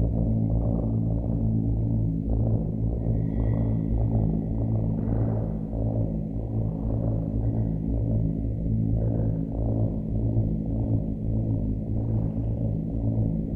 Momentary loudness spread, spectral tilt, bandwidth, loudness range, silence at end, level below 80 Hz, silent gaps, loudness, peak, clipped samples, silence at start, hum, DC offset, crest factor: 3 LU; -13.5 dB/octave; 2.1 kHz; 2 LU; 0 s; -32 dBFS; none; -27 LUFS; -12 dBFS; under 0.1%; 0 s; none; under 0.1%; 14 dB